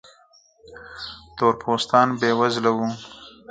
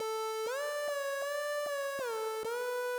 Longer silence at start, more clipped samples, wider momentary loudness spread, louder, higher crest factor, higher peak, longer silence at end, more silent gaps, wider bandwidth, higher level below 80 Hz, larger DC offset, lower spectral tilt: first, 0.7 s vs 0 s; neither; first, 20 LU vs 1 LU; first, -21 LUFS vs -36 LUFS; first, 22 dB vs 8 dB; first, -2 dBFS vs -28 dBFS; first, 0.2 s vs 0 s; neither; second, 9.4 kHz vs over 20 kHz; first, -60 dBFS vs -82 dBFS; neither; first, -5 dB/octave vs 0 dB/octave